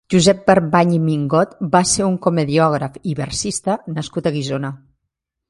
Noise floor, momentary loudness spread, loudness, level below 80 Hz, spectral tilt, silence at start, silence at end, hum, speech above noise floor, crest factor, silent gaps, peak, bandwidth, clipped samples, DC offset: -78 dBFS; 10 LU; -17 LUFS; -48 dBFS; -5 dB/octave; 0.1 s; 0.75 s; none; 61 dB; 18 dB; none; 0 dBFS; 11.5 kHz; under 0.1%; under 0.1%